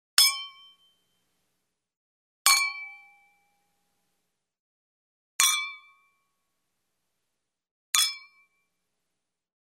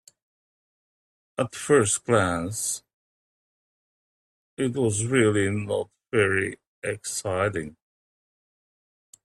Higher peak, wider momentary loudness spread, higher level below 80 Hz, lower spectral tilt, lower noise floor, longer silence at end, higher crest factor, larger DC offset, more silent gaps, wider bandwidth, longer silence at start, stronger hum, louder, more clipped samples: first, -2 dBFS vs -6 dBFS; first, 22 LU vs 12 LU; second, -84 dBFS vs -60 dBFS; second, 6 dB/octave vs -4.5 dB/octave; second, -85 dBFS vs under -90 dBFS; about the same, 1.55 s vs 1.55 s; first, 32 dB vs 22 dB; neither; second, 1.97-2.45 s, 4.59-5.39 s, 7.71-7.93 s vs 2.94-4.57 s, 6.67-6.82 s; first, 16 kHz vs 14 kHz; second, 0.2 s vs 1.4 s; neither; about the same, -23 LUFS vs -25 LUFS; neither